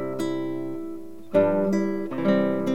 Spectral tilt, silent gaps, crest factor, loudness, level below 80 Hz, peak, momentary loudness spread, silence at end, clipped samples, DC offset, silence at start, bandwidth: -7.5 dB/octave; none; 18 dB; -25 LUFS; -66 dBFS; -8 dBFS; 12 LU; 0 s; under 0.1%; 1%; 0 s; 16 kHz